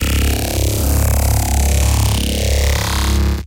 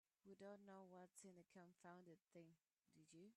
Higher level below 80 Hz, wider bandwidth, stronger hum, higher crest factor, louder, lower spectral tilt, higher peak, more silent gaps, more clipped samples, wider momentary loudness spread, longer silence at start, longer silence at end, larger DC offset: first, -16 dBFS vs under -90 dBFS; first, 17.5 kHz vs 11 kHz; neither; about the same, 12 dB vs 16 dB; first, -16 LUFS vs -65 LUFS; about the same, -4.5 dB/octave vs -5 dB/octave; first, -2 dBFS vs -50 dBFS; neither; neither; second, 2 LU vs 6 LU; second, 0 s vs 0.25 s; about the same, 0 s vs 0 s; neither